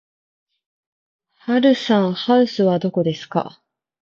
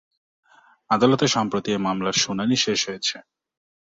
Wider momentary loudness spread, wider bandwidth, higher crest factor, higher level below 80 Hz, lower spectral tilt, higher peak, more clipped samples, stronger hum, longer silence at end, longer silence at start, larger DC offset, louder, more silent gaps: about the same, 9 LU vs 7 LU; about the same, 7.4 kHz vs 7.8 kHz; about the same, 18 dB vs 20 dB; second, -68 dBFS vs -60 dBFS; first, -7 dB/octave vs -3.5 dB/octave; about the same, -2 dBFS vs -4 dBFS; neither; neither; second, 0.55 s vs 0.8 s; first, 1.45 s vs 0.9 s; neither; first, -18 LUFS vs -22 LUFS; neither